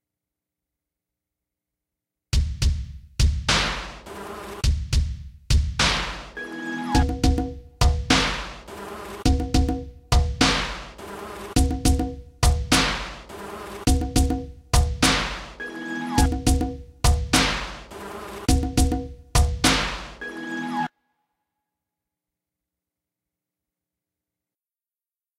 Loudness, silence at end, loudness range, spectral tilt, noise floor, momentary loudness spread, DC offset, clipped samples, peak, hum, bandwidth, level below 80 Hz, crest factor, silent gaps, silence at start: -23 LUFS; 4.5 s; 4 LU; -4 dB/octave; under -90 dBFS; 16 LU; under 0.1%; under 0.1%; -4 dBFS; none; 16 kHz; -28 dBFS; 22 dB; none; 2.35 s